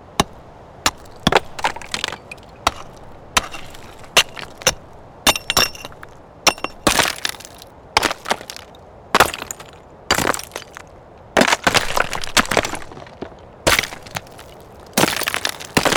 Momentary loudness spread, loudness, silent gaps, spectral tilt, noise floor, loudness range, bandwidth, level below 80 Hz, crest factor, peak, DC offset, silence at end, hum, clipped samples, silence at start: 21 LU; -19 LUFS; none; -2 dB/octave; -42 dBFS; 3 LU; over 20 kHz; -40 dBFS; 22 dB; 0 dBFS; under 0.1%; 0 s; none; under 0.1%; 0 s